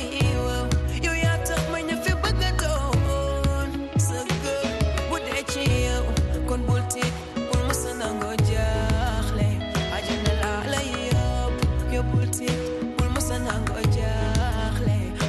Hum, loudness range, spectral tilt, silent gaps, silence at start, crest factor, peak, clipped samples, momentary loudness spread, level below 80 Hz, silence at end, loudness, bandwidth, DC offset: none; 1 LU; -5 dB/octave; none; 0 s; 16 dB; -8 dBFS; under 0.1%; 3 LU; -28 dBFS; 0 s; -25 LUFS; 12.5 kHz; under 0.1%